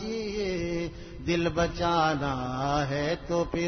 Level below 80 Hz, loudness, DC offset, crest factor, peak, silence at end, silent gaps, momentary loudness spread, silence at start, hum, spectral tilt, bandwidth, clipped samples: -44 dBFS; -29 LUFS; under 0.1%; 16 dB; -12 dBFS; 0 s; none; 7 LU; 0 s; none; -5.5 dB/octave; 6.6 kHz; under 0.1%